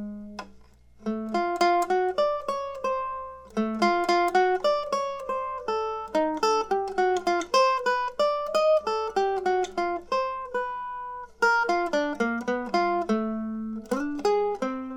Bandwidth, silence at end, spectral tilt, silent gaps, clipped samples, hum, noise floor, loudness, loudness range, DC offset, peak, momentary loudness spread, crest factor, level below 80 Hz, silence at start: 17.5 kHz; 0 s; -4 dB/octave; none; under 0.1%; none; -52 dBFS; -26 LUFS; 3 LU; under 0.1%; -10 dBFS; 10 LU; 18 dB; -58 dBFS; 0 s